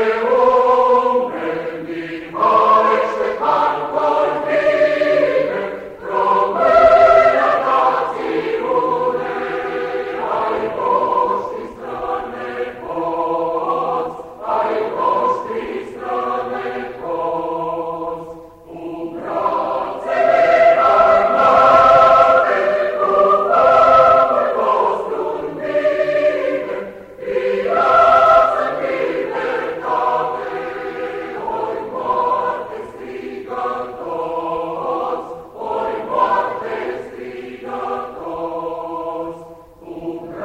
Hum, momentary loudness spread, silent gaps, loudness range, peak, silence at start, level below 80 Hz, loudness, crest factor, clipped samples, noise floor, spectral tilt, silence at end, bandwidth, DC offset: none; 16 LU; none; 11 LU; 0 dBFS; 0 s; -50 dBFS; -16 LUFS; 16 dB; under 0.1%; -38 dBFS; -5.5 dB/octave; 0 s; 8.8 kHz; under 0.1%